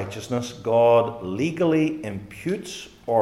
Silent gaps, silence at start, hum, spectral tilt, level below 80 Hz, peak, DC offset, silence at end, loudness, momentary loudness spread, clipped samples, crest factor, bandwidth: none; 0 s; none; -6 dB/octave; -58 dBFS; -6 dBFS; under 0.1%; 0 s; -23 LUFS; 15 LU; under 0.1%; 16 dB; 13 kHz